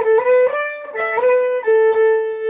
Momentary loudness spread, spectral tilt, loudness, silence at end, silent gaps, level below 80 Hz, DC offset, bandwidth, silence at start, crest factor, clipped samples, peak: 9 LU; -6 dB/octave; -16 LUFS; 0 s; none; -66 dBFS; under 0.1%; 3.8 kHz; 0 s; 10 dB; under 0.1%; -6 dBFS